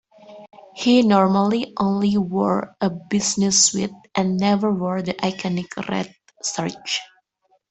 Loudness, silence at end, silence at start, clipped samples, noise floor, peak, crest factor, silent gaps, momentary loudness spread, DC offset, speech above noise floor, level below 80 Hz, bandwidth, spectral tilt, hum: -20 LUFS; 0.65 s; 0.3 s; under 0.1%; -65 dBFS; -2 dBFS; 18 dB; none; 11 LU; under 0.1%; 45 dB; -58 dBFS; 8.4 kHz; -4 dB/octave; none